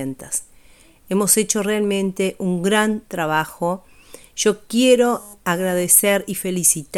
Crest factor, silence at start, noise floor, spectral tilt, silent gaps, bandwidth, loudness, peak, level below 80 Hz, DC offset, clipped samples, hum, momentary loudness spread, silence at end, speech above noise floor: 20 dB; 0 s; -49 dBFS; -3.5 dB/octave; none; 19 kHz; -18 LUFS; 0 dBFS; -56 dBFS; under 0.1%; under 0.1%; none; 11 LU; 0 s; 30 dB